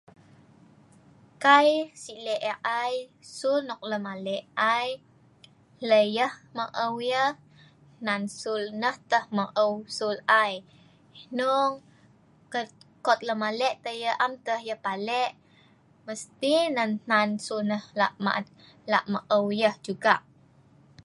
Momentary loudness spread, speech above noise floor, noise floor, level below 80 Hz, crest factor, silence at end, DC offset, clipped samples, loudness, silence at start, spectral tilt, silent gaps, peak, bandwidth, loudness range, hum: 13 LU; 33 dB; -59 dBFS; -76 dBFS; 24 dB; 0.85 s; under 0.1%; under 0.1%; -27 LUFS; 1.4 s; -4 dB/octave; none; -4 dBFS; 11.5 kHz; 3 LU; none